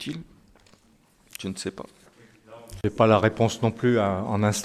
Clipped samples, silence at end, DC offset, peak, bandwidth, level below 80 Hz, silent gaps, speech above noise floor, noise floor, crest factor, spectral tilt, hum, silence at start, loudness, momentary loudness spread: under 0.1%; 0 s; under 0.1%; -4 dBFS; 14.5 kHz; -50 dBFS; none; 37 dB; -60 dBFS; 22 dB; -6 dB/octave; none; 0 s; -24 LUFS; 24 LU